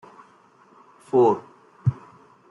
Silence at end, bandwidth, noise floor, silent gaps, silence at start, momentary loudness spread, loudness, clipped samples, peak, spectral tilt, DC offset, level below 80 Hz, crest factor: 0.6 s; 10.5 kHz; -55 dBFS; none; 1.15 s; 11 LU; -23 LUFS; under 0.1%; -8 dBFS; -10 dB/octave; under 0.1%; -62 dBFS; 18 dB